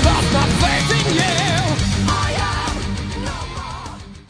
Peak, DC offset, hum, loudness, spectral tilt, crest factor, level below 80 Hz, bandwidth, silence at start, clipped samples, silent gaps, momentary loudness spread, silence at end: -2 dBFS; under 0.1%; none; -18 LUFS; -4.5 dB/octave; 16 dB; -26 dBFS; 11 kHz; 0 s; under 0.1%; none; 13 LU; 0.1 s